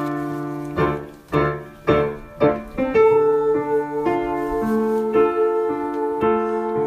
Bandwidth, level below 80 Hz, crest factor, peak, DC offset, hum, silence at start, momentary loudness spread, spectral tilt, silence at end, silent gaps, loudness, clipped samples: 13.5 kHz; -44 dBFS; 16 dB; -4 dBFS; under 0.1%; none; 0 s; 9 LU; -8 dB/octave; 0 s; none; -21 LUFS; under 0.1%